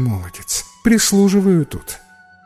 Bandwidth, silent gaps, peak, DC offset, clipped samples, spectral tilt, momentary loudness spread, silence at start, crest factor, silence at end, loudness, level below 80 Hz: 16 kHz; none; -2 dBFS; under 0.1%; under 0.1%; -4.5 dB/octave; 17 LU; 0 s; 14 dB; 0.5 s; -16 LUFS; -40 dBFS